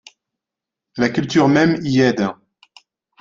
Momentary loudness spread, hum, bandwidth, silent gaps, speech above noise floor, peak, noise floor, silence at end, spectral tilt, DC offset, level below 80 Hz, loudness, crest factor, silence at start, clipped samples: 9 LU; none; 7.6 kHz; none; 70 dB; -2 dBFS; -86 dBFS; 0.9 s; -6 dB/octave; under 0.1%; -56 dBFS; -17 LUFS; 18 dB; 0.95 s; under 0.1%